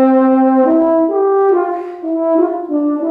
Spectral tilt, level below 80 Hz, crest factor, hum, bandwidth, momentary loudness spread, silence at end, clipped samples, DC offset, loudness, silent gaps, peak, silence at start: -9 dB/octave; -60 dBFS; 10 dB; none; 3.9 kHz; 8 LU; 0 s; under 0.1%; under 0.1%; -13 LUFS; none; -2 dBFS; 0 s